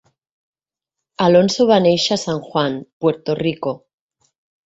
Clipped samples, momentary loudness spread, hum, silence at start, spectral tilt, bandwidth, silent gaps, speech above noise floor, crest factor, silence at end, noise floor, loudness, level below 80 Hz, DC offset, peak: under 0.1%; 10 LU; none; 1.2 s; -5 dB/octave; 8.2 kHz; 2.93-3.01 s; 68 dB; 18 dB; 0.9 s; -84 dBFS; -17 LUFS; -58 dBFS; under 0.1%; -2 dBFS